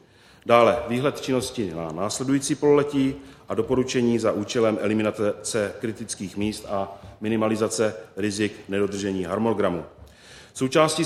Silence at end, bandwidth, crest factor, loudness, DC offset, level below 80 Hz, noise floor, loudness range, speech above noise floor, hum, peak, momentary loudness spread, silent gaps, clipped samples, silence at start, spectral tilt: 0 s; 14.5 kHz; 22 dB; -24 LUFS; under 0.1%; -54 dBFS; -48 dBFS; 4 LU; 24 dB; none; -2 dBFS; 11 LU; none; under 0.1%; 0.45 s; -5 dB/octave